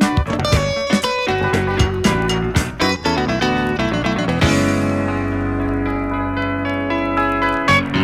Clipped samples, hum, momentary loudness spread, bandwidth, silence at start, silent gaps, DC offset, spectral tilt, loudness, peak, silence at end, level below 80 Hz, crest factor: under 0.1%; none; 5 LU; 15.5 kHz; 0 s; none; under 0.1%; -5.5 dB/octave; -18 LUFS; -6 dBFS; 0 s; -30 dBFS; 12 dB